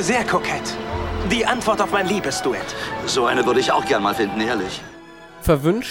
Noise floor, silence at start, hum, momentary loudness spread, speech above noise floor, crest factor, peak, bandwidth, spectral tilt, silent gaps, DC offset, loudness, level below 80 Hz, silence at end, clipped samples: -41 dBFS; 0 s; none; 9 LU; 21 dB; 18 dB; -4 dBFS; 18 kHz; -4 dB/octave; none; under 0.1%; -20 LUFS; -38 dBFS; 0 s; under 0.1%